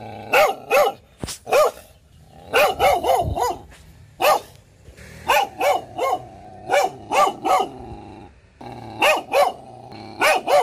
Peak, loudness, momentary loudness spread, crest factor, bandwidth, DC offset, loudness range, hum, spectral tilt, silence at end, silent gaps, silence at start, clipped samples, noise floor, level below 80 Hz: -6 dBFS; -20 LUFS; 20 LU; 14 dB; 16 kHz; under 0.1%; 3 LU; none; -3 dB/octave; 0 s; none; 0 s; under 0.1%; -49 dBFS; -46 dBFS